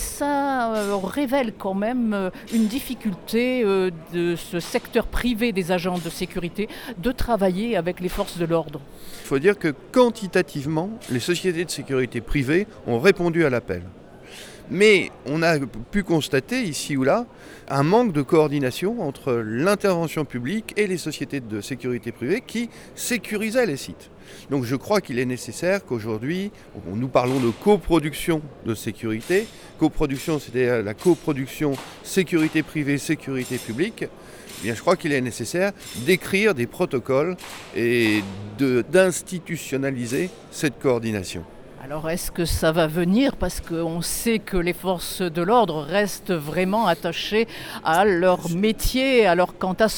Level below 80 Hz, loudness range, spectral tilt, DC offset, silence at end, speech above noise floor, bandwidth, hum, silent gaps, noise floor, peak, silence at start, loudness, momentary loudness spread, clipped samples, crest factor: -42 dBFS; 4 LU; -5 dB/octave; under 0.1%; 0 s; 19 dB; over 20 kHz; none; none; -42 dBFS; -4 dBFS; 0 s; -23 LUFS; 10 LU; under 0.1%; 20 dB